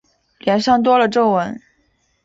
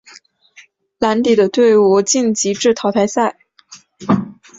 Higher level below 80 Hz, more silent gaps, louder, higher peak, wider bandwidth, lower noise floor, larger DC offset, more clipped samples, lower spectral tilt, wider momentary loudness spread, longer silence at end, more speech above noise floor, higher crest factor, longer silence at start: about the same, -56 dBFS vs -56 dBFS; neither; about the same, -16 LUFS vs -14 LUFS; about the same, -2 dBFS vs -2 dBFS; about the same, 7.8 kHz vs 7.8 kHz; first, -63 dBFS vs -48 dBFS; neither; neither; first, -5.5 dB/octave vs -4 dB/octave; first, 13 LU vs 7 LU; first, 0.65 s vs 0.25 s; first, 48 dB vs 34 dB; about the same, 14 dB vs 14 dB; second, 0.45 s vs 1 s